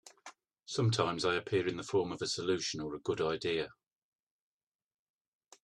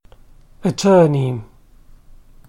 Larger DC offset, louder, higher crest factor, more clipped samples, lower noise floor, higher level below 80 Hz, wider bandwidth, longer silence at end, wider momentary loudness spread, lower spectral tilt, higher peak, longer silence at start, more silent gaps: neither; second, -34 LUFS vs -16 LUFS; about the same, 22 dB vs 18 dB; neither; first, -57 dBFS vs -45 dBFS; second, -70 dBFS vs -46 dBFS; second, 11 kHz vs 12.5 kHz; first, 1.95 s vs 1.05 s; about the same, 11 LU vs 12 LU; second, -4.5 dB/octave vs -6.5 dB/octave; second, -14 dBFS vs -2 dBFS; second, 0.05 s vs 0.6 s; neither